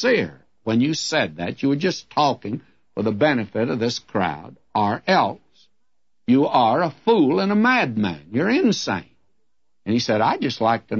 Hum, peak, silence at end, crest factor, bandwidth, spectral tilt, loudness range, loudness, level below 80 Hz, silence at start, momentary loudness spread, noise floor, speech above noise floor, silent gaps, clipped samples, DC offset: none; -4 dBFS; 0 s; 18 dB; 8 kHz; -5.5 dB/octave; 4 LU; -21 LUFS; -62 dBFS; 0 s; 11 LU; -79 dBFS; 59 dB; none; under 0.1%; 0.1%